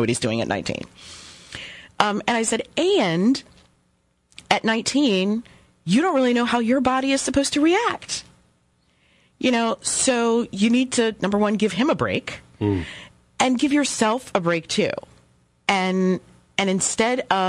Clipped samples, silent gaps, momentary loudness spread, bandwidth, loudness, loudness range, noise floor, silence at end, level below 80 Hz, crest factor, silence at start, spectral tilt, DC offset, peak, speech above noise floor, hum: under 0.1%; none; 12 LU; 12 kHz; -21 LUFS; 3 LU; -65 dBFS; 0 s; -56 dBFS; 20 dB; 0 s; -4 dB/octave; under 0.1%; -2 dBFS; 45 dB; none